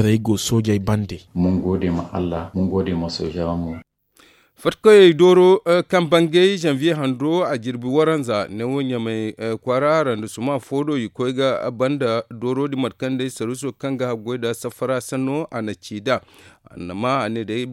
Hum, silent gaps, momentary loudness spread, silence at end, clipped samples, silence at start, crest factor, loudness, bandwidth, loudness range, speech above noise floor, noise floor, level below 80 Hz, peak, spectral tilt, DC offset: none; none; 12 LU; 0 s; under 0.1%; 0 s; 18 dB; -20 LUFS; 15 kHz; 9 LU; 35 dB; -54 dBFS; -50 dBFS; 0 dBFS; -6 dB/octave; under 0.1%